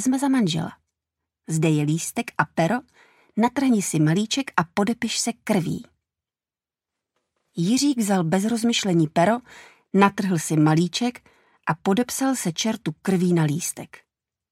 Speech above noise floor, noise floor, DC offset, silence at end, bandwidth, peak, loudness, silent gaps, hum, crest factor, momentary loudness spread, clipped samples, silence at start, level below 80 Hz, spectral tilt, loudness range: over 68 dB; under -90 dBFS; under 0.1%; 0.65 s; 16 kHz; 0 dBFS; -22 LUFS; none; none; 22 dB; 9 LU; under 0.1%; 0 s; -64 dBFS; -5 dB/octave; 5 LU